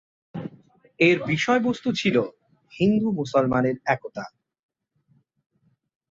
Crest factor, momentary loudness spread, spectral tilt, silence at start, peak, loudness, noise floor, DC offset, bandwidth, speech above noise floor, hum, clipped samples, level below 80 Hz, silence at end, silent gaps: 20 dB; 17 LU; -6 dB/octave; 0.35 s; -6 dBFS; -23 LUFS; -65 dBFS; under 0.1%; 7.8 kHz; 43 dB; none; under 0.1%; -60 dBFS; 1.85 s; none